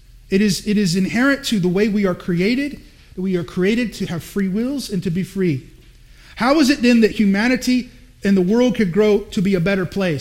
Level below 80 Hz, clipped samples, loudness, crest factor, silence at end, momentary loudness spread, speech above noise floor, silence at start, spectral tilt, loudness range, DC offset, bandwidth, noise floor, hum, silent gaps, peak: -44 dBFS; under 0.1%; -18 LUFS; 16 dB; 0 s; 8 LU; 27 dB; 0.3 s; -6 dB/octave; 6 LU; under 0.1%; 16 kHz; -45 dBFS; none; none; -2 dBFS